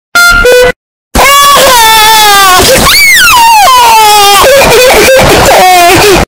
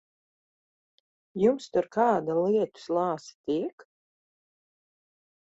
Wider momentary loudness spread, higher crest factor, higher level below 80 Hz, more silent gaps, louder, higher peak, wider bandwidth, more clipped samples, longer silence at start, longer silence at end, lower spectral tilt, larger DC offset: second, 3 LU vs 9 LU; second, 2 dB vs 20 dB; first, -20 dBFS vs -72 dBFS; first, 0.76-1.11 s vs 3.35-3.44 s, 3.73-3.78 s; first, -1 LUFS vs -27 LUFS; first, 0 dBFS vs -10 dBFS; first, over 20 kHz vs 8 kHz; first, 30% vs under 0.1%; second, 0.15 s vs 1.35 s; second, 0.05 s vs 1.75 s; second, -2 dB/octave vs -6.5 dB/octave; neither